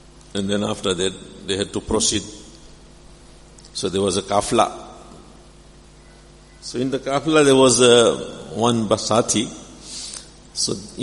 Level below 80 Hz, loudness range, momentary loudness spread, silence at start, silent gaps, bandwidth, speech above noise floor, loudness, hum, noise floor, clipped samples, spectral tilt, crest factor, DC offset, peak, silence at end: -46 dBFS; 8 LU; 21 LU; 0.35 s; none; 11.5 kHz; 27 dB; -19 LUFS; none; -46 dBFS; under 0.1%; -3.5 dB/octave; 22 dB; under 0.1%; 0 dBFS; 0 s